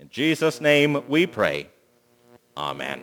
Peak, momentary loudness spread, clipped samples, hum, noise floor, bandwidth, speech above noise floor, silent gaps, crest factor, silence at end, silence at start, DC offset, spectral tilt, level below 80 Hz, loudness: -4 dBFS; 13 LU; under 0.1%; 60 Hz at -55 dBFS; -61 dBFS; over 20 kHz; 39 dB; none; 20 dB; 0 s; 0.15 s; under 0.1%; -5 dB/octave; -64 dBFS; -22 LUFS